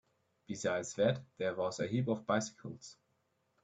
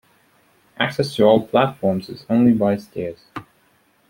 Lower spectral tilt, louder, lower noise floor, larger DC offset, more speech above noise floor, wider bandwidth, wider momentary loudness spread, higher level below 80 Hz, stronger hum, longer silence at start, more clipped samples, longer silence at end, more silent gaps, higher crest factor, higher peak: second, -5 dB/octave vs -7 dB/octave; second, -36 LUFS vs -19 LUFS; first, -79 dBFS vs -59 dBFS; neither; about the same, 43 dB vs 41 dB; second, 9.2 kHz vs 16.5 kHz; about the same, 15 LU vs 16 LU; second, -74 dBFS vs -58 dBFS; neither; second, 0.5 s vs 0.8 s; neither; about the same, 0.7 s vs 0.7 s; neither; about the same, 20 dB vs 18 dB; second, -16 dBFS vs -2 dBFS